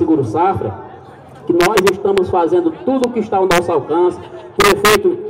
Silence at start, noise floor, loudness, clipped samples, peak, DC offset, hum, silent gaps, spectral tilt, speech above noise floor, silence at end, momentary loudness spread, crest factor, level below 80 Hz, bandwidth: 0 s; -37 dBFS; -14 LUFS; under 0.1%; -2 dBFS; under 0.1%; none; none; -4.5 dB/octave; 23 dB; 0 s; 12 LU; 12 dB; -42 dBFS; 16.5 kHz